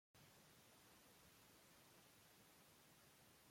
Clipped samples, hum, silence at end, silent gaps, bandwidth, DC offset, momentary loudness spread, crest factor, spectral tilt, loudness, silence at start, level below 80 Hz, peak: under 0.1%; none; 0 s; none; 16.5 kHz; under 0.1%; 1 LU; 14 dB; -2.5 dB/octave; -69 LUFS; 0.15 s; -90 dBFS; -56 dBFS